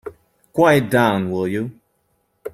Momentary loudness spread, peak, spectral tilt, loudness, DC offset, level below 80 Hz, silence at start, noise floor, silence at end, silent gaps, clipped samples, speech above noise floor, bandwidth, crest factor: 19 LU; -2 dBFS; -6.5 dB/octave; -18 LUFS; under 0.1%; -56 dBFS; 0.05 s; -67 dBFS; 0.05 s; none; under 0.1%; 50 dB; 16 kHz; 18 dB